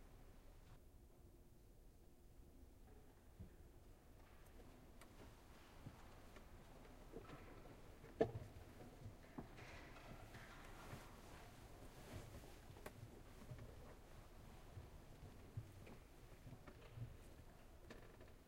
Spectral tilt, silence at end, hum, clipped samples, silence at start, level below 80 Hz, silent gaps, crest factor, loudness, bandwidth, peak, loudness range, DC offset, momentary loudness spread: -6 dB/octave; 0 s; none; under 0.1%; 0 s; -64 dBFS; none; 34 dB; -59 LUFS; 16 kHz; -24 dBFS; 14 LU; under 0.1%; 10 LU